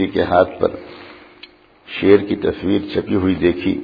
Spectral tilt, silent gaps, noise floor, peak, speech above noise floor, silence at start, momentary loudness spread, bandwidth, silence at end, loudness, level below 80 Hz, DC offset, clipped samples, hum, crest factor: -9 dB/octave; none; -45 dBFS; 0 dBFS; 28 dB; 0 s; 17 LU; 5 kHz; 0 s; -17 LUFS; -46 dBFS; under 0.1%; under 0.1%; none; 18 dB